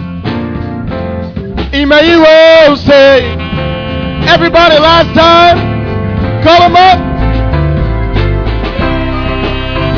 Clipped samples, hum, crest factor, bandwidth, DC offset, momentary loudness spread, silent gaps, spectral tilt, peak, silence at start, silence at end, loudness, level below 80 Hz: 5%; none; 8 dB; 5.4 kHz; under 0.1%; 14 LU; none; -6.5 dB/octave; 0 dBFS; 0 s; 0 s; -7 LUFS; -20 dBFS